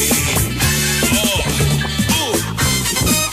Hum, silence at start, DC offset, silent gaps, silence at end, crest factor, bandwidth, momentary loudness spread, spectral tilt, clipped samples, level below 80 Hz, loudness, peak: none; 0 s; under 0.1%; none; 0 s; 14 dB; 16 kHz; 3 LU; -3 dB/octave; under 0.1%; -28 dBFS; -15 LUFS; -2 dBFS